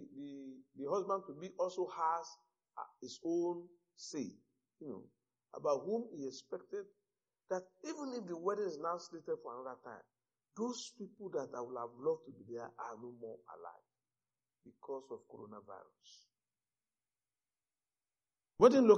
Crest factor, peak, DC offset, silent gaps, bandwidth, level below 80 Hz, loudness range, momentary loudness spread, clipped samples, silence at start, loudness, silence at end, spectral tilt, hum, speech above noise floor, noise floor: 28 dB; -12 dBFS; under 0.1%; none; 7.4 kHz; -78 dBFS; 14 LU; 17 LU; under 0.1%; 0 s; -40 LUFS; 0 s; -5 dB/octave; none; over 52 dB; under -90 dBFS